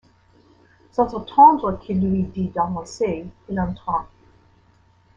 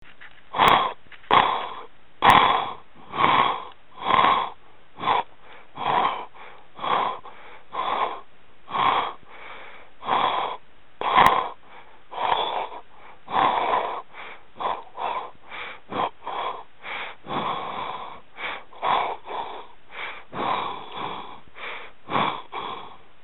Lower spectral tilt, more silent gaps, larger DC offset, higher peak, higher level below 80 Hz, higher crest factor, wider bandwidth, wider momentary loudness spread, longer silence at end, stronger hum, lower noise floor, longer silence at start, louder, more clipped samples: first, -7.5 dB/octave vs -4.5 dB/octave; neither; second, under 0.1% vs 0.9%; about the same, -2 dBFS vs 0 dBFS; first, -46 dBFS vs -56 dBFS; second, 20 dB vs 26 dB; second, 7.8 kHz vs 17 kHz; second, 14 LU vs 22 LU; first, 1.15 s vs 0.3 s; neither; first, -57 dBFS vs -52 dBFS; first, 0.95 s vs 0.2 s; first, -21 LUFS vs -24 LUFS; neither